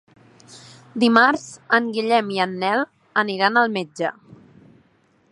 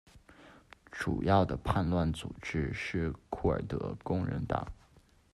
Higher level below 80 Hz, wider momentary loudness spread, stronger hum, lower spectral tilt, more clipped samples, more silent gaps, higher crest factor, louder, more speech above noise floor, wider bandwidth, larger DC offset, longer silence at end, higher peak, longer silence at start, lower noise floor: second, -70 dBFS vs -48 dBFS; first, 12 LU vs 9 LU; neither; second, -4.5 dB/octave vs -7.5 dB/octave; neither; neither; about the same, 22 dB vs 20 dB; first, -20 LUFS vs -33 LUFS; first, 40 dB vs 31 dB; about the same, 11 kHz vs 12 kHz; neither; first, 1.2 s vs 0.35 s; first, 0 dBFS vs -14 dBFS; first, 0.5 s vs 0.15 s; about the same, -60 dBFS vs -63 dBFS